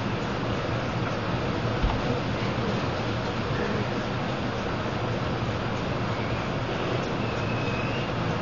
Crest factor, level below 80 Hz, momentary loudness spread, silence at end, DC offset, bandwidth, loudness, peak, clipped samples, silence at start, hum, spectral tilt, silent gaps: 16 dB; -40 dBFS; 2 LU; 0 s; 0.5%; 7.4 kHz; -28 LUFS; -12 dBFS; under 0.1%; 0 s; none; -6.5 dB/octave; none